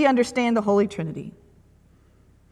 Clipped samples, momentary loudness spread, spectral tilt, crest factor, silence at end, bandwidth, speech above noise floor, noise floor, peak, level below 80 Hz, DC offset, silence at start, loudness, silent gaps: under 0.1%; 16 LU; -6 dB/octave; 20 dB; 1.2 s; 12 kHz; 34 dB; -56 dBFS; -4 dBFS; -58 dBFS; under 0.1%; 0 s; -22 LUFS; none